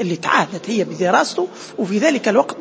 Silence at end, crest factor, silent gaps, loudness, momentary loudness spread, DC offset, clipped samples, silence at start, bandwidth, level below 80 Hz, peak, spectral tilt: 0 s; 18 dB; none; -18 LUFS; 8 LU; under 0.1%; under 0.1%; 0 s; 8 kHz; -70 dBFS; 0 dBFS; -4.5 dB/octave